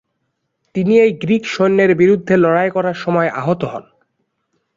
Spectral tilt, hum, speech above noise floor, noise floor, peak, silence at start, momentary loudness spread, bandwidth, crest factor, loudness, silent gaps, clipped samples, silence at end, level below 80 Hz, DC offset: -7.5 dB/octave; none; 57 dB; -71 dBFS; -2 dBFS; 0.75 s; 9 LU; 7.6 kHz; 14 dB; -15 LUFS; none; under 0.1%; 0.95 s; -56 dBFS; under 0.1%